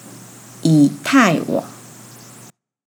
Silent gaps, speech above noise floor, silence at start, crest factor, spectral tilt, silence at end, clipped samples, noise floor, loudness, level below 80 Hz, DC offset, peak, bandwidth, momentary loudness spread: none; 31 dB; 0.05 s; 18 dB; -5.5 dB/octave; 1.15 s; under 0.1%; -45 dBFS; -16 LUFS; -72 dBFS; under 0.1%; 0 dBFS; 20 kHz; 24 LU